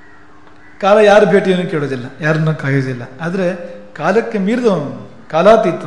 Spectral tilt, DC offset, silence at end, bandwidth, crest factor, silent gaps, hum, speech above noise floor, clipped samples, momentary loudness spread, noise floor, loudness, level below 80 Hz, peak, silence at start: -7 dB/octave; 1%; 0 s; 10.5 kHz; 14 dB; none; none; 30 dB; under 0.1%; 15 LU; -43 dBFS; -14 LUFS; -50 dBFS; 0 dBFS; 0.8 s